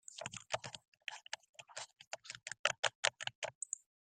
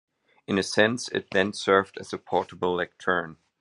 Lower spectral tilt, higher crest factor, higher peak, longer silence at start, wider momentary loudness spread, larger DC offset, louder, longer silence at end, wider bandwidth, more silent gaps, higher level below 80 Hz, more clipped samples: second, 0 dB/octave vs -4 dB/octave; first, 30 dB vs 22 dB; second, -14 dBFS vs -4 dBFS; second, 0.1 s vs 0.5 s; first, 14 LU vs 8 LU; neither; second, -42 LUFS vs -26 LUFS; first, 0.4 s vs 0.25 s; first, 14 kHz vs 11.5 kHz; first, 0.88-0.92 s, 1.49-1.54 s, 2.07-2.11 s, 2.59-2.64 s, 2.79-2.83 s, 2.95-3.03 s, 3.35-3.42 s, 3.55-3.61 s vs none; second, -82 dBFS vs -70 dBFS; neither